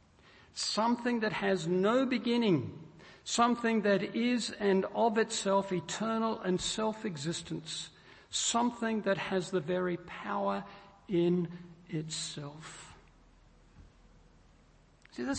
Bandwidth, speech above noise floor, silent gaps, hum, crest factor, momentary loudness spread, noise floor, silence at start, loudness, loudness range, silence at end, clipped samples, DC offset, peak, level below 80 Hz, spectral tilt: 8.8 kHz; 31 dB; none; none; 18 dB; 16 LU; -62 dBFS; 0.55 s; -32 LUFS; 7 LU; 0 s; under 0.1%; under 0.1%; -14 dBFS; -66 dBFS; -4.5 dB/octave